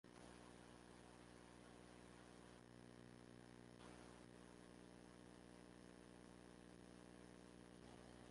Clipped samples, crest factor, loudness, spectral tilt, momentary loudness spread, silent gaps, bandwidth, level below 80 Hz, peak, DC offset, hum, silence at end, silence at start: under 0.1%; 16 dB; -64 LUFS; -5 dB/octave; 1 LU; none; 11.5 kHz; -76 dBFS; -48 dBFS; under 0.1%; 60 Hz at -70 dBFS; 0 s; 0.05 s